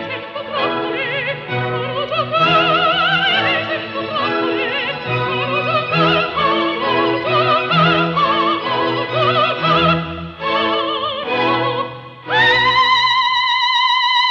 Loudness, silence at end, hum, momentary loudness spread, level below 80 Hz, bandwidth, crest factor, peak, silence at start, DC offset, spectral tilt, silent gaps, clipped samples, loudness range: -16 LUFS; 0 s; none; 8 LU; -50 dBFS; 7.8 kHz; 16 dB; -2 dBFS; 0 s; under 0.1%; -5.5 dB/octave; none; under 0.1%; 2 LU